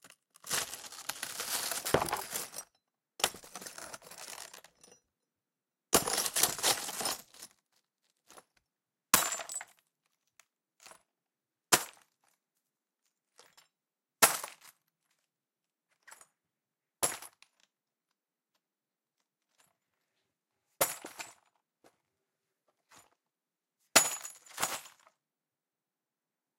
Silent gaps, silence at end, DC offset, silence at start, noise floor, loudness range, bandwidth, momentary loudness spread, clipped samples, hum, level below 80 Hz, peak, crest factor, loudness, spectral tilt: none; 1.7 s; under 0.1%; 0.05 s; under -90 dBFS; 10 LU; 17 kHz; 20 LU; under 0.1%; none; -70 dBFS; -6 dBFS; 32 dB; -31 LUFS; -0.5 dB/octave